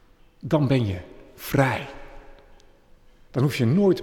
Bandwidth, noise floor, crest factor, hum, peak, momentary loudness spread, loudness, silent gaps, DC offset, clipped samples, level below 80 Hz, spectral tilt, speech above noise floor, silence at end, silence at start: 18 kHz; -53 dBFS; 18 dB; none; -6 dBFS; 19 LU; -23 LUFS; none; under 0.1%; under 0.1%; -48 dBFS; -7 dB/octave; 31 dB; 0 s; 0.45 s